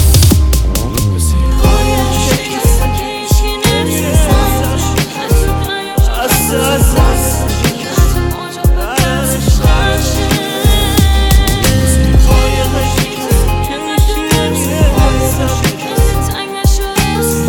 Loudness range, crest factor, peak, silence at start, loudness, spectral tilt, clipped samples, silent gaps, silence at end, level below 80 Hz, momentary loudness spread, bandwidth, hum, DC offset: 2 LU; 10 dB; 0 dBFS; 0 s; -12 LUFS; -4.5 dB/octave; under 0.1%; none; 0 s; -14 dBFS; 5 LU; 20 kHz; none; under 0.1%